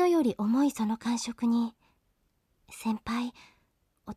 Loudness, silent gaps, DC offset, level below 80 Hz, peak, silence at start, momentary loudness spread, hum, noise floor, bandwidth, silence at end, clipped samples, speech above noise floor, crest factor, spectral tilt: -30 LUFS; none; under 0.1%; -64 dBFS; -16 dBFS; 0 s; 11 LU; none; -73 dBFS; 14 kHz; 0 s; under 0.1%; 44 dB; 14 dB; -5 dB/octave